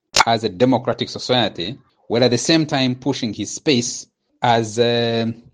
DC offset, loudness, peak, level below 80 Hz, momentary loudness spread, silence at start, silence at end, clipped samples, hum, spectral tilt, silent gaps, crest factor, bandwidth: under 0.1%; -19 LUFS; 0 dBFS; -54 dBFS; 8 LU; 0.15 s; 0.15 s; under 0.1%; none; -4 dB/octave; none; 20 dB; 10 kHz